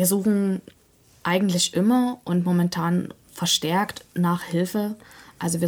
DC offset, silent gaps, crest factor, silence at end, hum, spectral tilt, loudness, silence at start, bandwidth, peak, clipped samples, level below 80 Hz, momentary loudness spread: under 0.1%; none; 16 dB; 0 s; none; -4.5 dB/octave; -23 LUFS; 0 s; 19.5 kHz; -8 dBFS; under 0.1%; -62 dBFS; 11 LU